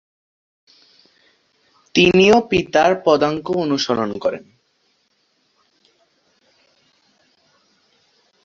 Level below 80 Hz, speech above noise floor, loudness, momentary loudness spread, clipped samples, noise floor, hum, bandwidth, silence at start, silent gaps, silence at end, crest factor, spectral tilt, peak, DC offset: -54 dBFS; 49 dB; -16 LUFS; 11 LU; under 0.1%; -65 dBFS; none; 7.6 kHz; 1.95 s; none; 4.05 s; 20 dB; -5 dB/octave; -2 dBFS; under 0.1%